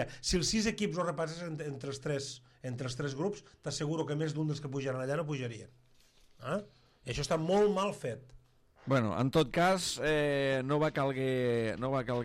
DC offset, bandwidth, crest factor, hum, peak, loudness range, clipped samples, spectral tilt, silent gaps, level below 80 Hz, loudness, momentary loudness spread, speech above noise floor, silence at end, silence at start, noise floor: under 0.1%; 15.5 kHz; 18 dB; none; -16 dBFS; 7 LU; under 0.1%; -5 dB/octave; none; -56 dBFS; -33 LUFS; 12 LU; 30 dB; 0 s; 0 s; -63 dBFS